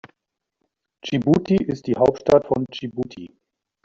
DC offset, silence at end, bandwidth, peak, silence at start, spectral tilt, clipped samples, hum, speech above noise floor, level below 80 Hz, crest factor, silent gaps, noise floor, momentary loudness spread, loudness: under 0.1%; 0.6 s; 7.6 kHz; -4 dBFS; 1.05 s; -6.5 dB/octave; under 0.1%; none; 60 dB; -52 dBFS; 18 dB; none; -80 dBFS; 13 LU; -21 LUFS